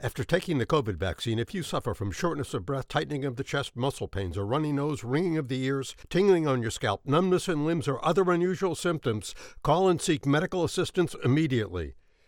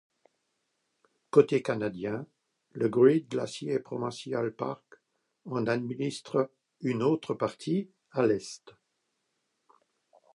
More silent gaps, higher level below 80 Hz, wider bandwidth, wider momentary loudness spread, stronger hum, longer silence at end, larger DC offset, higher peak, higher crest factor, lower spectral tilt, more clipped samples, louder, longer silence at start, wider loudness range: neither; first, -52 dBFS vs -74 dBFS; first, 17 kHz vs 11.5 kHz; second, 8 LU vs 13 LU; neither; second, 0.35 s vs 1.65 s; neither; about the same, -10 dBFS vs -8 dBFS; second, 18 dB vs 24 dB; about the same, -6 dB/octave vs -6.5 dB/octave; neither; about the same, -28 LUFS vs -30 LUFS; second, 0 s vs 1.35 s; about the same, 5 LU vs 5 LU